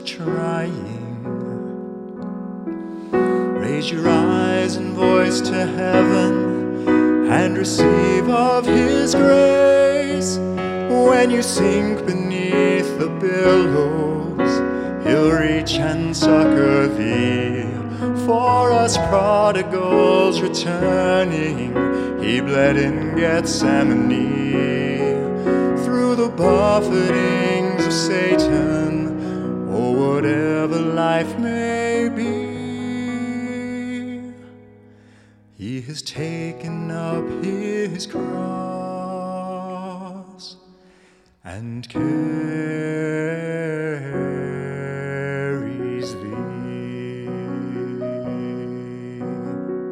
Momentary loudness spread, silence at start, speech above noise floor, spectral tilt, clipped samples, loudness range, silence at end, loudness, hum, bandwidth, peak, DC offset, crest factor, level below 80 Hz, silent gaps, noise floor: 14 LU; 0 s; 36 dB; -5.5 dB/octave; under 0.1%; 12 LU; 0 s; -19 LUFS; none; 13 kHz; 0 dBFS; under 0.1%; 18 dB; -46 dBFS; none; -54 dBFS